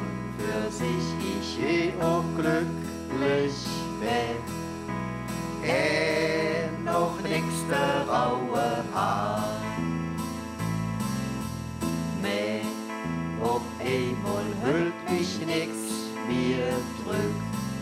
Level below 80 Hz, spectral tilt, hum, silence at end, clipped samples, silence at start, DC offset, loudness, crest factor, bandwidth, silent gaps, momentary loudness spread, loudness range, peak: -50 dBFS; -5.5 dB/octave; none; 0 s; under 0.1%; 0 s; under 0.1%; -28 LUFS; 16 dB; 16 kHz; none; 7 LU; 4 LU; -12 dBFS